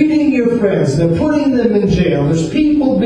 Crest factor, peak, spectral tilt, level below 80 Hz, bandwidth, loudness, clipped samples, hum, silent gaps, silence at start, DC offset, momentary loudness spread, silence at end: 12 dB; 0 dBFS; -7.5 dB/octave; -34 dBFS; 10.5 kHz; -13 LUFS; under 0.1%; none; none; 0 s; under 0.1%; 1 LU; 0 s